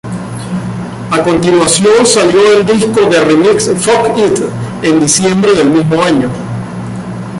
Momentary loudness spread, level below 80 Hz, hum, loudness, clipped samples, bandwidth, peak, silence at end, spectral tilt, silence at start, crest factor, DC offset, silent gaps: 14 LU; -40 dBFS; none; -9 LUFS; under 0.1%; 11.5 kHz; 0 dBFS; 0 s; -4.5 dB/octave; 0.05 s; 10 dB; under 0.1%; none